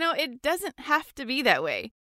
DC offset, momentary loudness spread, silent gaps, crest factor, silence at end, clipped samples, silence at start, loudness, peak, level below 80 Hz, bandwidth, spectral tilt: under 0.1%; 8 LU; none; 20 dB; 0.25 s; under 0.1%; 0 s; -26 LUFS; -6 dBFS; -62 dBFS; 16 kHz; -2.5 dB/octave